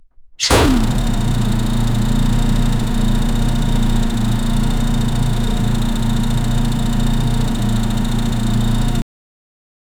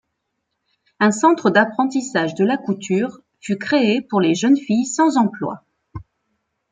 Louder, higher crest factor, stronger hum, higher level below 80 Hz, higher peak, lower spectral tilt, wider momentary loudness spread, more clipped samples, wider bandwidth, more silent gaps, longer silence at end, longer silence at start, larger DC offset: about the same, -18 LUFS vs -18 LUFS; about the same, 14 dB vs 18 dB; neither; first, -18 dBFS vs -58 dBFS; about the same, -2 dBFS vs -2 dBFS; about the same, -5.5 dB/octave vs -5 dB/octave; second, 3 LU vs 19 LU; neither; first, 17.5 kHz vs 9.6 kHz; neither; first, 1 s vs 0.7 s; second, 0.2 s vs 1 s; neither